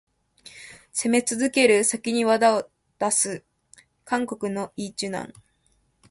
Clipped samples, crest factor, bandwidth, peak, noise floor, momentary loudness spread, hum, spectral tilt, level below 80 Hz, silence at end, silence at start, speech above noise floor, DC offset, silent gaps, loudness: under 0.1%; 20 dB; 12 kHz; -6 dBFS; -67 dBFS; 21 LU; none; -3 dB/octave; -66 dBFS; 0.8 s; 0.45 s; 44 dB; under 0.1%; none; -23 LUFS